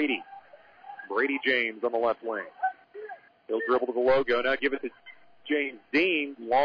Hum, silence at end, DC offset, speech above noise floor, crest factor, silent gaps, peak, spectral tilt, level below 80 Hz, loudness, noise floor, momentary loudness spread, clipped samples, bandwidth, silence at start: none; 0 s; under 0.1%; 26 dB; 14 dB; none; -16 dBFS; -6 dB/octave; -66 dBFS; -27 LUFS; -53 dBFS; 20 LU; under 0.1%; 5.4 kHz; 0 s